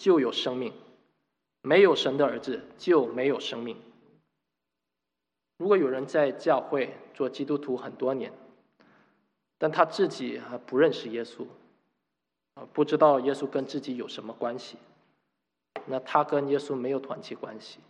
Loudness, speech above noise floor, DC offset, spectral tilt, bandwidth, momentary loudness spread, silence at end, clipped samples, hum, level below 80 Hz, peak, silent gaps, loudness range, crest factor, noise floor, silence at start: -27 LUFS; 59 dB; under 0.1%; -5.5 dB/octave; 9.4 kHz; 18 LU; 0.15 s; under 0.1%; none; -82 dBFS; -6 dBFS; none; 5 LU; 24 dB; -86 dBFS; 0 s